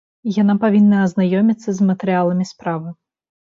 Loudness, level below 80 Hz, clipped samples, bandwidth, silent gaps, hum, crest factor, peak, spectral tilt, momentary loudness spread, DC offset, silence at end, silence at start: -17 LUFS; -62 dBFS; under 0.1%; 7.4 kHz; none; none; 12 dB; -4 dBFS; -8 dB/octave; 11 LU; under 0.1%; 0.5 s; 0.25 s